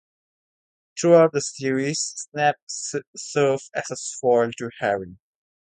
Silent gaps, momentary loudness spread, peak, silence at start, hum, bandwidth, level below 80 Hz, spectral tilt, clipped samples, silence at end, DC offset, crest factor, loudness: 2.62-2.67 s, 3.07-3.13 s; 13 LU; -4 dBFS; 0.95 s; none; 9.6 kHz; -66 dBFS; -4 dB/octave; under 0.1%; 0.6 s; under 0.1%; 20 dB; -23 LUFS